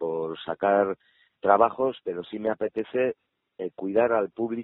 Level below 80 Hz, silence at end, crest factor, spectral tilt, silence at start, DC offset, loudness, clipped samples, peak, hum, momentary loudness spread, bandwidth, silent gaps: -68 dBFS; 0 s; 22 dB; -4.5 dB/octave; 0 s; under 0.1%; -26 LUFS; under 0.1%; -4 dBFS; none; 13 LU; 4.1 kHz; none